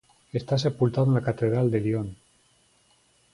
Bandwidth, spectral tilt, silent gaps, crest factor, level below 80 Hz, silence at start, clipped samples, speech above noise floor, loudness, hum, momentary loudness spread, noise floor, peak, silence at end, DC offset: 11 kHz; -8 dB/octave; none; 18 dB; -58 dBFS; 0.35 s; under 0.1%; 39 dB; -25 LUFS; none; 10 LU; -63 dBFS; -10 dBFS; 1.2 s; under 0.1%